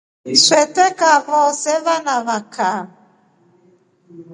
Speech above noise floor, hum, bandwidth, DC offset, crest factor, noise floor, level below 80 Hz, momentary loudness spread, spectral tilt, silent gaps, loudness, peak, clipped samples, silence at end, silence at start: 39 dB; none; 11 kHz; under 0.1%; 18 dB; -55 dBFS; -72 dBFS; 10 LU; -1 dB/octave; none; -15 LUFS; 0 dBFS; under 0.1%; 0 s; 0.25 s